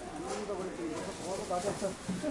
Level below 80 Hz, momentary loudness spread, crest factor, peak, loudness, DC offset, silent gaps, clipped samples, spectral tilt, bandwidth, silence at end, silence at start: -58 dBFS; 4 LU; 14 dB; -22 dBFS; -37 LUFS; under 0.1%; none; under 0.1%; -4.5 dB/octave; 11.5 kHz; 0 s; 0 s